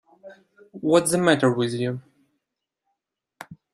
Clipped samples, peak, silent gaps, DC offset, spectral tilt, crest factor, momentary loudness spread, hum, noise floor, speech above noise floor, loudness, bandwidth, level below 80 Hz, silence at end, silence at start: under 0.1%; -4 dBFS; none; under 0.1%; -5 dB/octave; 22 dB; 21 LU; none; -83 dBFS; 61 dB; -21 LUFS; 15 kHz; -66 dBFS; 0.2 s; 0.25 s